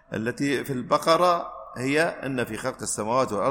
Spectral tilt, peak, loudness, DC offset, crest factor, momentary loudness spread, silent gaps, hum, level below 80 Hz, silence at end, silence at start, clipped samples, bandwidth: -4.5 dB/octave; -6 dBFS; -25 LUFS; under 0.1%; 20 dB; 10 LU; none; none; -58 dBFS; 0 s; 0.1 s; under 0.1%; 16.5 kHz